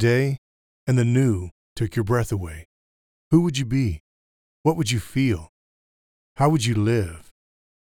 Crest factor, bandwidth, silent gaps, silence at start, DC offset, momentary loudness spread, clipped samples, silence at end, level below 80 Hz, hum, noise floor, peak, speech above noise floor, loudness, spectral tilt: 18 dB; 16.5 kHz; 0.38-0.86 s, 1.51-1.76 s, 2.65-3.31 s, 4.00-4.64 s, 5.49-6.36 s; 0 s; under 0.1%; 13 LU; under 0.1%; 0.6 s; -46 dBFS; none; under -90 dBFS; -6 dBFS; over 69 dB; -23 LUFS; -6.5 dB/octave